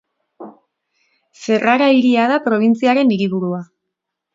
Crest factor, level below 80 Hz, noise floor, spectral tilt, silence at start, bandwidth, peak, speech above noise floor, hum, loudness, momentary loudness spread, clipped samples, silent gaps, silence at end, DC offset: 16 dB; -66 dBFS; -78 dBFS; -6.5 dB/octave; 0.4 s; 7.6 kHz; 0 dBFS; 64 dB; none; -15 LUFS; 11 LU; under 0.1%; none; 0.7 s; under 0.1%